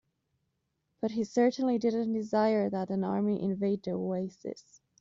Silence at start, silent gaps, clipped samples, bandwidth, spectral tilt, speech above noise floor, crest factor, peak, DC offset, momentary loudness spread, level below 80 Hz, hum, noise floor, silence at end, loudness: 1 s; none; under 0.1%; 7.6 kHz; -7 dB/octave; 50 dB; 16 dB; -14 dBFS; under 0.1%; 10 LU; -72 dBFS; none; -80 dBFS; 0.4 s; -30 LUFS